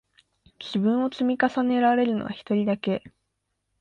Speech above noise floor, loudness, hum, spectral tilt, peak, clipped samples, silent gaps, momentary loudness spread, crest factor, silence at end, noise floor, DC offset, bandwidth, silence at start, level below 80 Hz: 54 dB; -24 LUFS; none; -7.5 dB/octave; -10 dBFS; under 0.1%; none; 9 LU; 16 dB; 0.7 s; -78 dBFS; under 0.1%; 7.2 kHz; 0.6 s; -64 dBFS